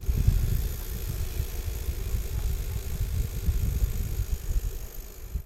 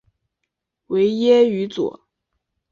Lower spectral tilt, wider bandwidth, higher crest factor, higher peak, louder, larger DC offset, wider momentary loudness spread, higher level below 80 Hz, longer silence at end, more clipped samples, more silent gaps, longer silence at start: about the same, -5.5 dB/octave vs -6.5 dB/octave; first, 16 kHz vs 7.2 kHz; about the same, 20 dB vs 16 dB; second, -8 dBFS vs -4 dBFS; second, -32 LUFS vs -18 LUFS; neither; second, 7 LU vs 11 LU; first, -30 dBFS vs -66 dBFS; second, 0 s vs 0.8 s; neither; neither; second, 0 s vs 0.9 s